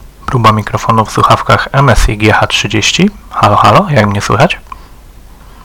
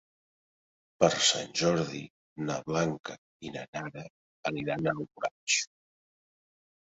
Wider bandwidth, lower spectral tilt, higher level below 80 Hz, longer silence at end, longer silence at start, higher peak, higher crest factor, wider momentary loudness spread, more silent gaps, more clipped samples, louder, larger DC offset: first, 18.5 kHz vs 8.2 kHz; first, -5 dB/octave vs -3 dB/octave; first, -22 dBFS vs -66 dBFS; second, 0.15 s vs 1.3 s; second, 0.2 s vs 1 s; first, 0 dBFS vs -8 dBFS; second, 10 dB vs 26 dB; second, 5 LU vs 17 LU; second, none vs 2.10-2.36 s, 3.00-3.04 s, 3.18-3.40 s, 3.68-3.73 s, 4.10-4.43 s, 5.31-5.47 s; first, 2% vs under 0.1%; first, -9 LUFS vs -30 LUFS; neither